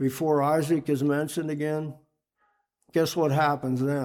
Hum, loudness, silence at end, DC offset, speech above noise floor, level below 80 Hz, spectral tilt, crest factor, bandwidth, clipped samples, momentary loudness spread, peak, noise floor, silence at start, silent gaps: none; -26 LUFS; 0 s; under 0.1%; 47 dB; -68 dBFS; -6.5 dB/octave; 14 dB; 18.5 kHz; under 0.1%; 7 LU; -12 dBFS; -72 dBFS; 0 s; none